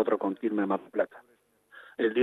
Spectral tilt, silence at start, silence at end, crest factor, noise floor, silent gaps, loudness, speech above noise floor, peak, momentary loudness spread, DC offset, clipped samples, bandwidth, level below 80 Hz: -8 dB/octave; 0 s; 0 s; 18 dB; -56 dBFS; none; -30 LUFS; 27 dB; -12 dBFS; 5 LU; under 0.1%; under 0.1%; 4.1 kHz; -80 dBFS